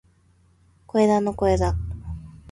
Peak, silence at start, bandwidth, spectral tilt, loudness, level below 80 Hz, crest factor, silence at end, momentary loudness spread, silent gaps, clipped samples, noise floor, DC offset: -8 dBFS; 0.95 s; 11.5 kHz; -7.5 dB/octave; -22 LUFS; -36 dBFS; 16 dB; 0.15 s; 17 LU; none; under 0.1%; -59 dBFS; under 0.1%